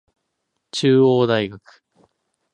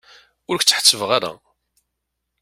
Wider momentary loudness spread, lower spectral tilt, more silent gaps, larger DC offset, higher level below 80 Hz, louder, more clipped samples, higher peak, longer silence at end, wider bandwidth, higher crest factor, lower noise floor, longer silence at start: about the same, 15 LU vs 14 LU; first, -6 dB/octave vs -0.5 dB/octave; neither; neither; about the same, -62 dBFS vs -64 dBFS; about the same, -18 LUFS vs -16 LUFS; neither; second, -4 dBFS vs 0 dBFS; about the same, 0.95 s vs 1.05 s; second, 9.8 kHz vs 16.5 kHz; about the same, 18 dB vs 22 dB; about the same, -75 dBFS vs -78 dBFS; first, 0.75 s vs 0.5 s